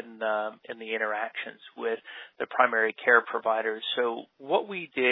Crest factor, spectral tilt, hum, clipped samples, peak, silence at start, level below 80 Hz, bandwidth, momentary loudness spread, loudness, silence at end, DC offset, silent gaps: 22 dB; -6.5 dB/octave; none; under 0.1%; -6 dBFS; 0 s; under -90 dBFS; 4.1 kHz; 15 LU; -28 LUFS; 0 s; under 0.1%; none